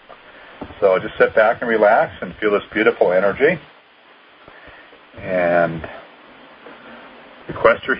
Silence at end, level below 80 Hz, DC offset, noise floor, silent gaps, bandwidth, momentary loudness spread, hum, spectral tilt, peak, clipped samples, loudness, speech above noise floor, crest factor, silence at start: 0 s; -50 dBFS; under 0.1%; -49 dBFS; none; 5.2 kHz; 22 LU; none; -10.5 dB/octave; 0 dBFS; under 0.1%; -17 LUFS; 32 dB; 18 dB; 0.1 s